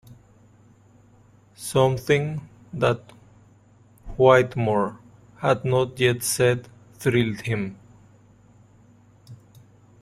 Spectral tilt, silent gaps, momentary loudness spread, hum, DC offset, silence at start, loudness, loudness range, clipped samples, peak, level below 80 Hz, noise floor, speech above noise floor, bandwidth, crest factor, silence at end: -5.5 dB/octave; none; 13 LU; none; under 0.1%; 0.1 s; -22 LUFS; 5 LU; under 0.1%; -2 dBFS; -52 dBFS; -54 dBFS; 33 dB; 15.5 kHz; 22 dB; 0.65 s